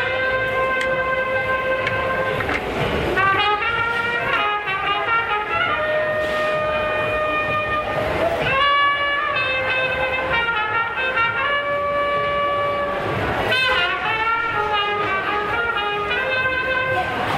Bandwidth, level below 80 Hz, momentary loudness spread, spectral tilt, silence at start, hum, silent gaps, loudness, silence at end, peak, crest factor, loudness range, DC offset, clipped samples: 15.5 kHz; -42 dBFS; 4 LU; -4.5 dB/octave; 0 s; none; none; -20 LUFS; 0 s; -6 dBFS; 14 dB; 1 LU; under 0.1%; under 0.1%